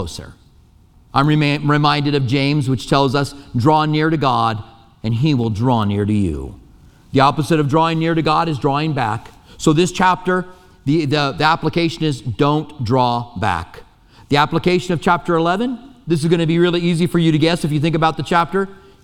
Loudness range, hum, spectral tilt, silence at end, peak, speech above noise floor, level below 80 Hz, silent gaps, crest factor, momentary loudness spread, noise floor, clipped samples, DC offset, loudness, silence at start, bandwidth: 2 LU; none; -6.5 dB/octave; 0.3 s; 0 dBFS; 33 dB; -42 dBFS; none; 16 dB; 8 LU; -49 dBFS; under 0.1%; under 0.1%; -17 LUFS; 0 s; 13.5 kHz